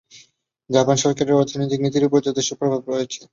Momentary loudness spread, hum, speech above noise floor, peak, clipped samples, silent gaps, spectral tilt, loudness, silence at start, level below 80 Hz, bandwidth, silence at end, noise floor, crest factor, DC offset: 6 LU; none; 37 dB; -2 dBFS; under 0.1%; none; -5 dB/octave; -20 LUFS; 0.15 s; -60 dBFS; 7.6 kHz; 0.1 s; -56 dBFS; 18 dB; under 0.1%